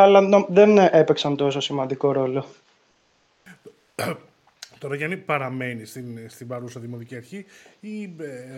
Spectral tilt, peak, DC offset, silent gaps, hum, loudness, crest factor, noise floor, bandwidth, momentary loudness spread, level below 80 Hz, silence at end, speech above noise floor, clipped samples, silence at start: -6 dB/octave; -2 dBFS; under 0.1%; none; none; -20 LUFS; 20 dB; -64 dBFS; 14 kHz; 22 LU; -70 dBFS; 0 s; 43 dB; under 0.1%; 0 s